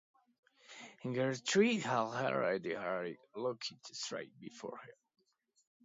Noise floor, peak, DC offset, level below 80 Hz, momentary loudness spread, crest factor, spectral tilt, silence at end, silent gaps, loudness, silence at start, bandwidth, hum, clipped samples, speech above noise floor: -56 dBFS; -18 dBFS; under 0.1%; -84 dBFS; 19 LU; 20 dB; -3.5 dB/octave; 0.95 s; none; -37 LUFS; 0.7 s; 7.6 kHz; none; under 0.1%; 19 dB